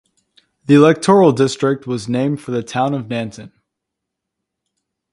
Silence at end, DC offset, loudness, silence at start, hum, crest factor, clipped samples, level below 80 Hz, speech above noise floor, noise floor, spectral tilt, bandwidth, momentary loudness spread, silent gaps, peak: 1.65 s; under 0.1%; -15 LUFS; 0.7 s; none; 18 dB; under 0.1%; -58 dBFS; 65 dB; -80 dBFS; -6.5 dB/octave; 11.5 kHz; 13 LU; none; 0 dBFS